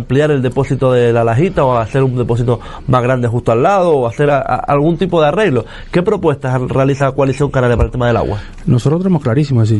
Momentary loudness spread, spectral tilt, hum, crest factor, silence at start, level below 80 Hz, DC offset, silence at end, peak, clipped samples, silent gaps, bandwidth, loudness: 4 LU; -8 dB/octave; none; 12 dB; 0 s; -32 dBFS; under 0.1%; 0 s; 0 dBFS; under 0.1%; none; 11 kHz; -13 LUFS